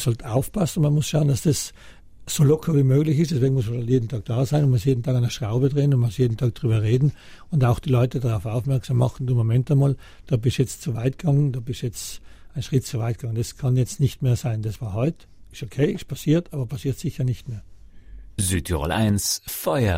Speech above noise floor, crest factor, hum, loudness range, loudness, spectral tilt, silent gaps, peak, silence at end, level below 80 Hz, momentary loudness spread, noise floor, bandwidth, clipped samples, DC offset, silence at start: 20 dB; 16 dB; none; 5 LU; -23 LUFS; -6.5 dB/octave; none; -6 dBFS; 0 s; -44 dBFS; 9 LU; -41 dBFS; 16 kHz; under 0.1%; under 0.1%; 0 s